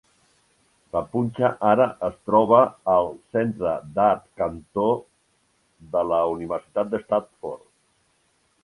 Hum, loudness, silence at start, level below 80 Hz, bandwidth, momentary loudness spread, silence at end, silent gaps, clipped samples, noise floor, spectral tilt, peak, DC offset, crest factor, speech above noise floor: none; -23 LUFS; 0.95 s; -56 dBFS; 11.5 kHz; 11 LU; 1.05 s; none; under 0.1%; -66 dBFS; -8 dB/octave; -4 dBFS; under 0.1%; 20 dB; 44 dB